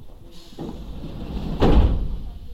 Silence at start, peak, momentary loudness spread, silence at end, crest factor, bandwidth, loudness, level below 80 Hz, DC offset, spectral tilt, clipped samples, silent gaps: 0 s; -4 dBFS; 18 LU; 0 s; 18 dB; 7.6 kHz; -23 LUFS; -24 dBFS; under 0.1%; -8 dB/octave; under 0.1%; none